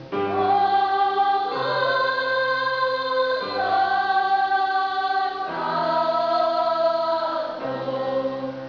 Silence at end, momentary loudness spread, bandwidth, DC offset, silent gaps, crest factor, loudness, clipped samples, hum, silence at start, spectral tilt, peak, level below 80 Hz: 0 s; 6 LU; 5.4 kHz; under 0.1%; none; 12 dB; -22 LUFS; under 0.1%; none; 0 s; -5.5 dB/octave; -10 dBFS; -66 dBFS